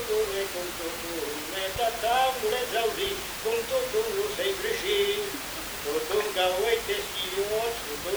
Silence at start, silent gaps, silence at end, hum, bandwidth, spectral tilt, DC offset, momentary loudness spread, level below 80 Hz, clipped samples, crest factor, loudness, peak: 0 s; none; 0 s; none; over 20 kHz; -2 dB/octave; under 0.1%; 7 LU; -52 dBFS; under 0.1%; 16 dB; -28 LUFS; -12 dBFS